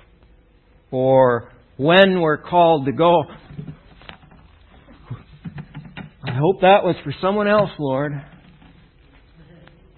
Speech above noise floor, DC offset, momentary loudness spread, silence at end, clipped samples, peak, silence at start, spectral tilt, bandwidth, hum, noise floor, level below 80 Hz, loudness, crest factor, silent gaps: 37 dB; under 0.1%; 23 LU; 1.75 s; under 0.1%; 0 dBFS; 0.9 s; -9 dB/octave; 4.4 kHz; none; -54 dBFS; -50 dBFS; -17 LUFS; 20 dB; none